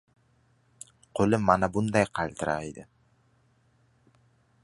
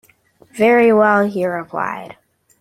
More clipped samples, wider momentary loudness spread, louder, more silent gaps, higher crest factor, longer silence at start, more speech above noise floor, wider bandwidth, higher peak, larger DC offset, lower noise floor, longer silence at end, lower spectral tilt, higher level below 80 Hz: neither; first, 25 LU vs 15 LU; second, -27 LUFS vs -15 LUFS; neither; first, 24 dB vs 16 dB; first, 1.15 s vs 0.55 s; about the same, 40 dB vs 37 dB; second, 11.5 kHz vs 14 kHz; second, -6 dBFS vs -2 dBFS; neither; first, -66 dBFS vs -52 dBFS; first, 1.8 s vs 0.5 s; about the same, -6.5 dB/octave vs -6.5 dB/octave; first, -54 dBFS vs -60 dBFS